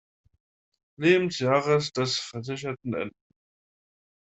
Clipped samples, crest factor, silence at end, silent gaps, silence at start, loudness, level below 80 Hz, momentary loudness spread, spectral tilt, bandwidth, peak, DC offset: under 0.1%; 22 dB; 1.1 s; none; 1 s; -26 LUFS; -68 dBFS; 11 LU; -5 dB/octave; 8.2 kHz; -6 dBFS; under 0.1%